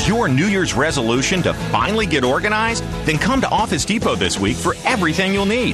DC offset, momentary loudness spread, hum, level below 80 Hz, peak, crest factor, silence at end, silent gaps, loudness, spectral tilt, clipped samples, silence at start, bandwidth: under 0.1%; 3 LU; none; -34 dBFS; -6 dBFS; 12 dB; 0 s; none; -17 LUFS; -4.5 dB/octave; under 0.1%; 0 s; 13 kHz